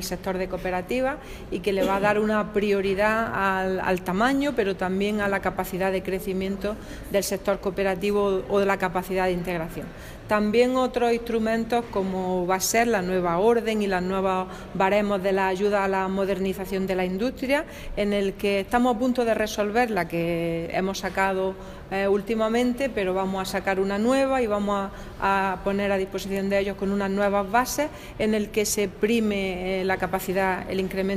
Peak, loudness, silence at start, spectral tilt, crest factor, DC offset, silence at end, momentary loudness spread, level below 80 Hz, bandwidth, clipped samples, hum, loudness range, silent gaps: -8 dBFS; -25 LUFS; 0 s; -5 dB/octave; 18 dB; under 0.1%; 0 s; 6 LU; -44 dBFS; 16 kHz; under 0.1%; none; 2 LU; none